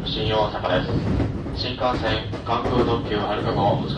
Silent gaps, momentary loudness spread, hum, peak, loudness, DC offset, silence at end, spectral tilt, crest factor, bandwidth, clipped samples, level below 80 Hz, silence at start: none; 5 LU; none; -8 dBFS; -23 LUFS; under 0.1%; 0 s; -7 dB/octave; 14 dB; 9 kHz; under 0.1%; -34 dBFS; 0 s